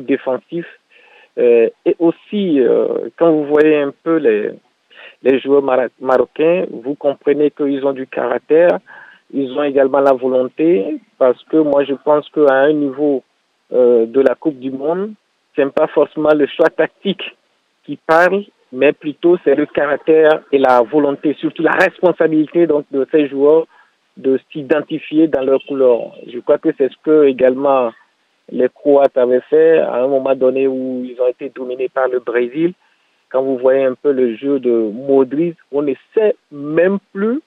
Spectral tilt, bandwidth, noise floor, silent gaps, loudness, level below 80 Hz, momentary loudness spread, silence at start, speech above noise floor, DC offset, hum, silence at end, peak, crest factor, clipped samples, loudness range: -7.5 dB/octave; 6.2 kHz; -47 dBFS; none; -15 LUFS; -64 dBFS; 10 LU; 0 s; 33 dB; under 0.1%; none; 0.05 s; 0 dBFS; 14 dB; under 0.1%; 3 LU